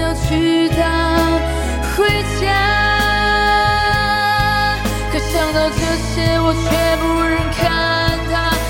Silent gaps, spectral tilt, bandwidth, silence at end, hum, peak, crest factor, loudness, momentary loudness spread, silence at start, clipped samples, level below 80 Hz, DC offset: none; -4.5 dB/octave; 17 kHz; 0 s; none; -2 dBFS; 14 dB; -15 LUFS; 5 LU; 0 s; under 0.1%; -24 dBFS; under 0.1%